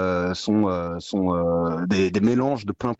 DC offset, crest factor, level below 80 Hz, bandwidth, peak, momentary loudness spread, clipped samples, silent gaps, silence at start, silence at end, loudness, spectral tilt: under 0.1%; 12 dB; -50 dBFS; 8.2 kHz; -10 dBFS; 6 LU; under 0.1%; none; 0 s; 0.05 s; -23 LUFS; -7 dB/octave